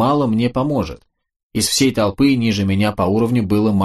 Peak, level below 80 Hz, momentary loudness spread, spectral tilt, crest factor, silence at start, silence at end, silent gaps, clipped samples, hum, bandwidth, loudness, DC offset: -4 dBFS; -42 dBFS; 5 LU; -5.5 dB/octave; 12 dB; 0 s; 0 s; 1.36-1.50 s; under 0.1%; none; 13 kHz; -17 LUFS; under 0.1%